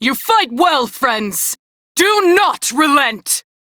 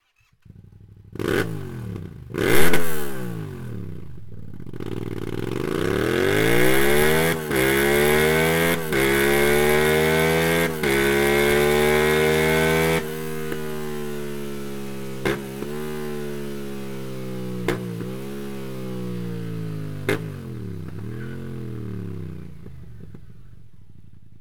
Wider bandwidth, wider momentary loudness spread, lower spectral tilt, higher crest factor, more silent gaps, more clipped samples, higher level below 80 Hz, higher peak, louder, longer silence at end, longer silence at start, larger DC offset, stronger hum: about the same, over 20 kHz vs 19 kHz; second, 7 LU vs 16 LU; second, -1.5 dB/octave vs -4.5 dB/octave; second, 14 dB vs 22 dB; first, 1.59-1.95 s vs none; neither; second, -58 dBFS vs -42 dBFS; about the same, -2 dBFS vs 0 dBFS; first, -14 LUFS vs -22 LUFS; first, 0.25 s vs 0 s; second, 0 s vs 0.6 s; neither; neither